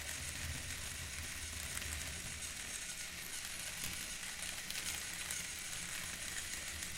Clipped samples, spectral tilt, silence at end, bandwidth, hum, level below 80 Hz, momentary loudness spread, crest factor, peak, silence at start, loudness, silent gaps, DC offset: under 0.1%; -1 dB/octave; 0 s; 17 kHz; none; -56 dBFS; 3 LU; 24 dB; -20 dBFS; 0 s; -42 LUFS; none; under 0.1%